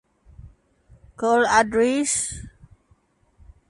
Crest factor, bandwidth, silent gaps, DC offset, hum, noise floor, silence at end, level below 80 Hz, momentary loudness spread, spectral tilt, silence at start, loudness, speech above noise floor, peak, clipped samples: 20 dB; 11.5 kHz; none; under 0.1%; none; -62 dBFS; 1.2 s; -50 dBFS; 11 LU; -3 dB/octave; 0.45 s; -20 LUFS; 42 dB; -4 dBFS; under 0.1%